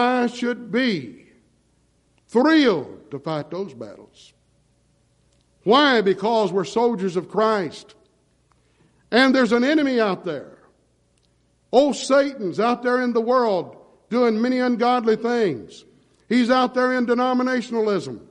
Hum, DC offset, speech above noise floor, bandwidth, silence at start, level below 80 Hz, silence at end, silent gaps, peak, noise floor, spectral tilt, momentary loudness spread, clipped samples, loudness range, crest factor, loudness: none; under 0.1%; 43 dB; 10.5 kHz; 0 s; -64 dBFS; 0.1 s; none; -4 dBFS; -63 dBFS; -5 dB/octave; 14 LU; under 0.1%; 3 LU; 18 dB; -20 LUFS